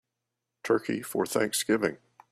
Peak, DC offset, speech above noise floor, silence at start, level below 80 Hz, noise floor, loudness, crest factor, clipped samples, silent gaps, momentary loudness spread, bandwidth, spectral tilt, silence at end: -10 dBFS; under 0.1%; 57 dB; 0.65 s; -70 dBFS; -85 dBFS; -28 LUFS; 20 dB; under 0.1%; none; 6 LU; 15.5 kHz; -3.5 dB/octave; 0.35 s